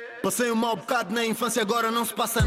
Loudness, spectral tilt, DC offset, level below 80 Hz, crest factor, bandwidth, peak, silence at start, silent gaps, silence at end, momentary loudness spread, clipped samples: -25 LUFS; -4 dB/octave; under 0.1%; -70 dBFS; 12 dB; 17 kHz; -14 dBFS; 0 s; none; 0 s; 3 LU; under 0.1%